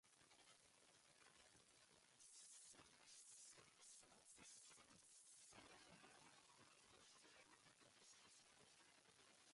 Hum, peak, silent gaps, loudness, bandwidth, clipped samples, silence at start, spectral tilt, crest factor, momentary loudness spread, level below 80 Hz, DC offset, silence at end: none; -54 dBFS; none; -66 LUFS; 11.5 kHz; under 0.1%; 0.05 s; -1 dB/octave; 16 dB; 6 LU; under -90 dBFS; under 0.1%; 0 s